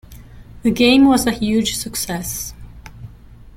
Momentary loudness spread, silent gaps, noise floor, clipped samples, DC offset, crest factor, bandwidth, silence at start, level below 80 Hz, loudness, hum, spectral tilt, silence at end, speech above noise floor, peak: 18 LU; none; -40 dBFS; under 0.1%; under 0.1%; 16 dB; 16.5 kHz; 0.1 s; -40 dBFS; -17 LUFS; none; -4 dB/octave; 0.05 s; 25 dB; -2 dBFS